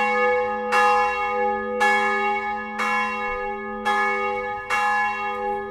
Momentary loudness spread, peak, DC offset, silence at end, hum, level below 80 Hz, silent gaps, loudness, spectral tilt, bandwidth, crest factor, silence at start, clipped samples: 8 LU; -6 dBFS; under 0.1%; 0 s; none; -52 dBFS; none; -22 LUFS; -3 dB/octave; 14 kHz; 16 dB; 0 s; under 0.1%